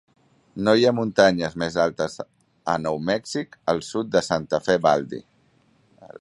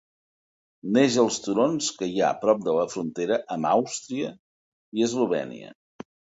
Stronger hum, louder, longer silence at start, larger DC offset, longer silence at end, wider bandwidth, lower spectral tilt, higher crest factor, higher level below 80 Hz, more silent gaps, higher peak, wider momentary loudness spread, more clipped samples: neither; first, -22 LUFS vs -25 LUFS; second, 0.55 s vs 0.85 s; neither; second, 0.15 s vs 0.7 s; first, 11.5 kHz vs 8 kHz; about the same, -5 dB/octave vs -4.5 dB/octave; about the same, 22 dB vs 20 dB; first, -56 dBFS vs -70 dBFS; second, none vs 4.39-4.92 s; first, -2 dBFS vs -6 dBFS; first, 16 LU vs 11 LU; neither